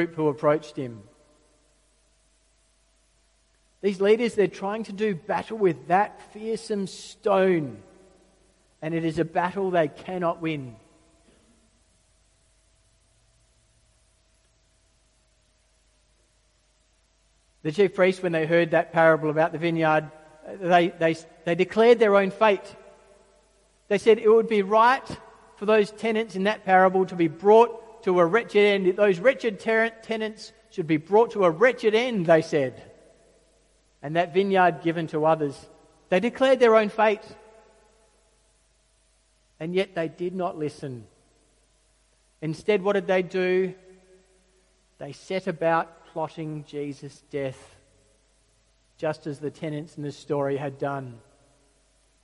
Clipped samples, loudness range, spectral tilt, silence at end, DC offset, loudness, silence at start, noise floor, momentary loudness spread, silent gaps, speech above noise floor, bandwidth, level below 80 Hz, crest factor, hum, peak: under 0.1%; 11 LU; -6.5 dB/octave; 1.05 s; under 0.1%; -24 LUFS; 0 s; -65 dBFS; 16 LU; none; 42 dB; 11.5 kHz; -64 dBFS; 20 dB; none; -4 dBFS